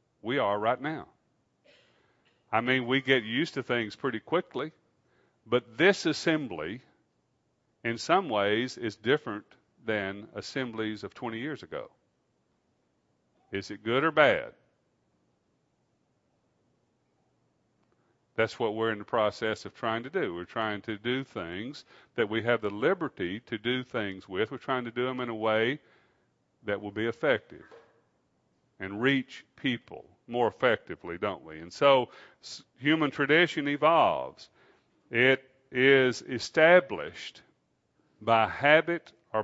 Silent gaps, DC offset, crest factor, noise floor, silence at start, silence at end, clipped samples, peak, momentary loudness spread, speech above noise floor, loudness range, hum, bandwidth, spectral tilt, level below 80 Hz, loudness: none; under 0.1%; 24 dB; -74 dBFS; 0.25 s; 0 s; under 0.1%; -6 dBFS; 16 LU; 46 dB; 9 LU; none; 8 kHz; -5 dB/octave; -70 dBFS; -28 LUFS